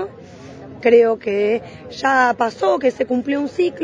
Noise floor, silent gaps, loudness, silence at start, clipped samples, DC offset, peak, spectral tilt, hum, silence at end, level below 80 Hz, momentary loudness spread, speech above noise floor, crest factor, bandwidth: -38 dBFS; none; -18 LUFS; 0 s; under 0.1%; under 0.1%; -2 dBFS; -5 dB/octave; none; 0 s; -58 dBFS; 16 LU; 21 dB; 16 dB; 9.4 kHz